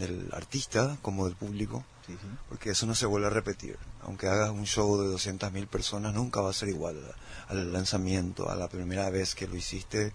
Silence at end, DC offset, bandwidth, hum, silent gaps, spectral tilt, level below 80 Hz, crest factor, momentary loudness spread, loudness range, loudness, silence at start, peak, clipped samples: 0 s; under 0.1%; 10.5 kHz; none; none; -4.5 dB/octave; -48 dBFS; 18 dB; 15 LU; 3 LU; -32 LUFS; 0 s; -14 dBFS; under 0.1%